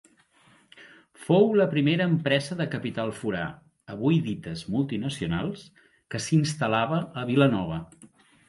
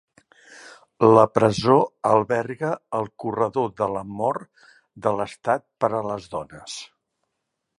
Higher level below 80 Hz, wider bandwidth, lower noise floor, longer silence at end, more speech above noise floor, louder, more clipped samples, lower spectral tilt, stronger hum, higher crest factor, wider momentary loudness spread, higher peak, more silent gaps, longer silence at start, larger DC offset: about the same, -56 dBFS vs -58 dBFS; about the same, 11.5 kHz vs 11 kHz; second, -60 dBFS vs -79 dBFS; second, 0.45 s vs 0.95 s; second, 35 dB vs 57 dB; second, -26 LUFS vs -22 LUFS; neither; about the same, -6.5 dB/octave vs -6.5 dB/octave; neither; about the same, 18 dB vs 22 dB; second, 13 LU vs 17 LU; second, -8 dBFS vs -2 dBFS; neither; first, 0.75 s vs 0.5 s; neither